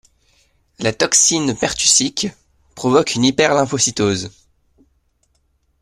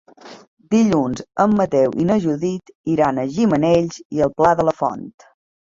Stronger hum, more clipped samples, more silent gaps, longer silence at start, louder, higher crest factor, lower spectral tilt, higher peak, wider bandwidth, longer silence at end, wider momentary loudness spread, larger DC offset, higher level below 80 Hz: neither; neither; second, none vs 0.48-0.57 s, 2.75-2.84 s, 4.05-4.10 s; first, 0.8 s vs 0.25 s; first, -15 LUFS vs -18 LUFS; about the same, 18 dB vs 16 dB; second, -2.5 dB/octave vs -7 dB/octave; about the same, 0 dBFS vs -2 dBFS; first, 15 kHz vs 7.6 kHz; first, 1.5 s vs 0.7 s; first, 12 LU vs 8 LU; neither; about the same, -50 dBFS vs -50 dBFS